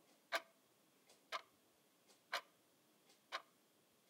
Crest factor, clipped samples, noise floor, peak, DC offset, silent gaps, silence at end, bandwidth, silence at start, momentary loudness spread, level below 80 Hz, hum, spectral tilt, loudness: 28 dB; under 0.1%; -75 dBFS; -26 dBFS; under 0.1%; none; 0.65 s; 16 kHz; 0.3 s; 6 LU; under -90 dBFS; none; 0 dB/octave; -49 LUFS